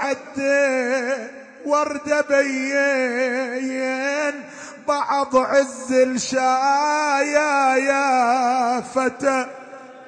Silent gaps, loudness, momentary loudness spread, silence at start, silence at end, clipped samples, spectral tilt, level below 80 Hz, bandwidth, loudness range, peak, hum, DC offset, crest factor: none; -20 LUFS; 8 LU; 0 s; 0 s; under 0.1%; -2.5 dB/octave; -66 dBFS; 9.8 kHz; 3 LU; -6 dBFS; none; under 0.1%; 14 dB